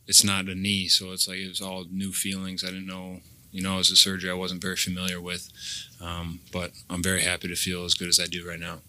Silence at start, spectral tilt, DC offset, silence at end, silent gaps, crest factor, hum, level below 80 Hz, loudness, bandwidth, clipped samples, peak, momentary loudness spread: 0.1 s; -2 dB/octave; under 0.1%; 0.1 s; none; 26 dB; none; -54 dBFS; -25 LUFS; 16 kHz; under 0.1%; -2 dBFS; 17 LU